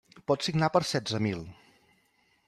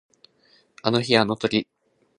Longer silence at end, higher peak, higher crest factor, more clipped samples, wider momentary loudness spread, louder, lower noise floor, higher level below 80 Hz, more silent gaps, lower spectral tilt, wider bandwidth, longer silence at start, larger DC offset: first, 0.95 s vs 0.55 s; second, -10 dBFS vs -2 dBFS; about the same, 22 dB vs 24 dB; neither; about the same, 11 LU vs 9 LU; second, -29 LUFS vs -22 LUFS; first, -69 dBFS vs -61 dBFS; about the same, -64 dBFS vs -62 dBFS; neither; about the same, -5 dB/octave vs -5.5 dB/octave; first, 13 kHz vs 10.5 kHz; second, 0.15 s vs 0.85 s; neither